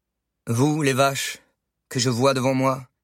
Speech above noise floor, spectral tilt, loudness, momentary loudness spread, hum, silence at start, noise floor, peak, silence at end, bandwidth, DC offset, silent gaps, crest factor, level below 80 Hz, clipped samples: 41 dB; -5 dB/octave; -22 LUFS; 11 LU; none; 0.45 s; -62 dBFS; -6 dBFS; 0.2 s; 16.5 kHz; under 0.1%; none; 18 dB; -64 dBFS; under 0.1%